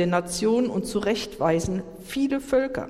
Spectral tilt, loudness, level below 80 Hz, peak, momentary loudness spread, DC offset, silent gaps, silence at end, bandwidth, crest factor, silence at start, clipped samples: -5 dB/octave; -25 LUFS; -48 dBFS; -10 dBFS; 6 LU; under 0.1%; none; 0 s; 16 kHz; 16 dB; 0 s; under 0.1%